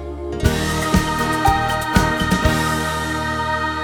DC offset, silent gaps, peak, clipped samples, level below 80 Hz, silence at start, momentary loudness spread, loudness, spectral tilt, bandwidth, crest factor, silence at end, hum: under 0.1%; none; 0 dBFS; under 0.1%; -28 dBFS; 0 s; 4 LU; -19 LUFS; -4.5 dB/octave; 19 kHz; 18 dB; 0 s; none